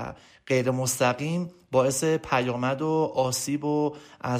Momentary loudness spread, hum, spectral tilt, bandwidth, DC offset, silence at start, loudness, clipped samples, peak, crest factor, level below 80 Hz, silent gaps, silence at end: 6 LU; none; -5 dB/octave; 15.5 kHz; under 0.1%; 0 s; -26 LUFS; under 0.1%; -10 dBFS; 16 dB; -60 dBFS; none; 0 s